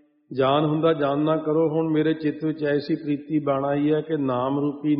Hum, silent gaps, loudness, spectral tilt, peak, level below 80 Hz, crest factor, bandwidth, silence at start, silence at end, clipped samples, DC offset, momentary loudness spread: none; none; -23 LUFS; -6 dB/octave; -6 dBFS; -64 dBFS; 16 dB; 5.2 kHz; 0.3 s; 0 s; under 0.1%; under 0.1%; 5 LU